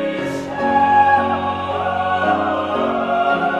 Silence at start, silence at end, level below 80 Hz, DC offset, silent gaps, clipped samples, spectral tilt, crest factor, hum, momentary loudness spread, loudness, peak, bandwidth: 0 s; 0 s; -52 dBFS; under 0.1%; none; under 0.1%; -6 dB/octave; 14 dB; none; 8 LU; -17 LUFS; -4 dBFS; 10.5 kHz